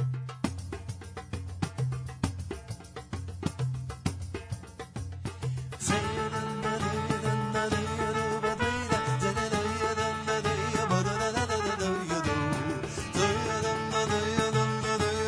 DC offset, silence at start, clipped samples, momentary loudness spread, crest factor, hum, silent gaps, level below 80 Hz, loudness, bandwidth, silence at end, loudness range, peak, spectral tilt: under 0.1%; 0 s; under 0.1%; 12 LU; 20 dB; none; none; -50 dBFS; -31 LUFS; 11 kHz; 0 s; 8 LU; -10 dBFS; -5 dB/octave